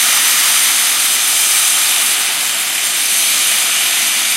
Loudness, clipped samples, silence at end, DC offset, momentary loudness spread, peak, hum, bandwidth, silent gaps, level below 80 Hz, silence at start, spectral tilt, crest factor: -10 LUFS; under 0.1%; 0 s; under 0.1%; 4 LU; 0 dBFS; none; 16 kHz; none; -78 dBFS; 0 s; 3.5 dB/octave; 14 dB